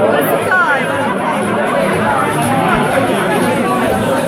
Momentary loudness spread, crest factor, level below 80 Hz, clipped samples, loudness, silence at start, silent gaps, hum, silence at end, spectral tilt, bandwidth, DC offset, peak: 3 LU; 12 dB; -42 dBFS; under 0.1%; -13 LUFS; 0 s; none; none; 0 s; -5 dB/octave; 16 kHz; under 0.1%; -2 dBFS